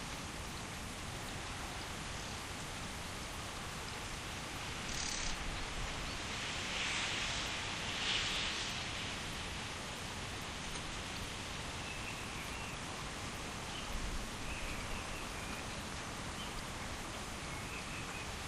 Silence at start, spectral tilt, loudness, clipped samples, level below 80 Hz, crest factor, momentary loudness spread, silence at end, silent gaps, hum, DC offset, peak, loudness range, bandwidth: 0 s; -2.5 dB/octave; -41 LUFS; under 0.1%; -50 dBFS; 20 dB; 7 LU; 0 s; none; none; under 0.1%; -22 dBFS; 6 LU; 15.5 kHz